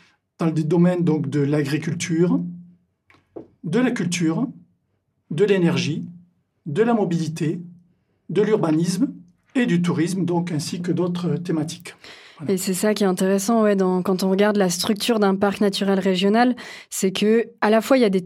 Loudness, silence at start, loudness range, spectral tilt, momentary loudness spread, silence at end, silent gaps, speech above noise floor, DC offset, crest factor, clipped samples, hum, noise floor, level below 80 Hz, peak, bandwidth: -21 LUFS; 0.4 s; 4 LU; -5.5 dB/octave; 11 LU; 0 s; none; 50 dB; under 0.1%; 18 dB; under 0.1%; none; -70 dBFS; -68 dBFS; -4 dBFS; 16 kHz